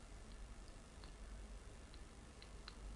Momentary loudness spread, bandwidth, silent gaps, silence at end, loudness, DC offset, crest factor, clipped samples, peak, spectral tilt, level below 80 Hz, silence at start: 2 LU; 11.5 kHz; none; 0 s; -58 LUFS; under 0.1%; 18 dB; under 0.1%; -36 dBFS; -4.5 dB/octave; -56 dBFS; 0 s